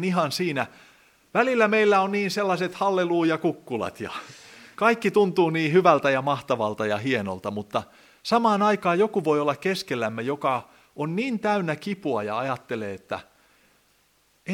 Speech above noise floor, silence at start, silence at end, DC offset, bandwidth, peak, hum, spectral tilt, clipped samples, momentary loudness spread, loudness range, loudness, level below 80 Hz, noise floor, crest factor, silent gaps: 41 dB; 0 s; 0 s; under 0.1%; 16 kHz; -4 dBFS; none; -5.5 dB/octave; under 0.1%; 13 LU; 5 LU; -24 LUFS; -70 dBFS; -64 dBFS; 20 dB; none